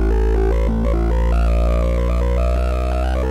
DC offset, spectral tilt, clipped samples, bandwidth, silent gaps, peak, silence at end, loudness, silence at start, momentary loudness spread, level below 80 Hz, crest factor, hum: under 0.1%; -8 dB/octave; under 0.1%; 7.8 kHz; none; -8 dBFS; 0 s; -19 LUFS; 0 s; 2 LU; -16 dBFS; 8 dB; none